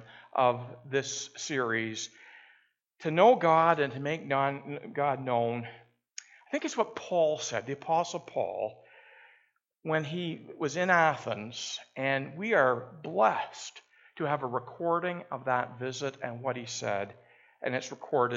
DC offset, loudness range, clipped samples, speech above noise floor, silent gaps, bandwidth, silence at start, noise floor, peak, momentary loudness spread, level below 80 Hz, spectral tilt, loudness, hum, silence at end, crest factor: under 0.1%; 6 LU; under 0.1%; 40 dB; none; 8 kHz; 0 s; -70 dBFS; -8 dBFS; 14 LU; -80 dBFS; -4.5 dB/octave; -30 LUFS; none; 0 s; 22 dB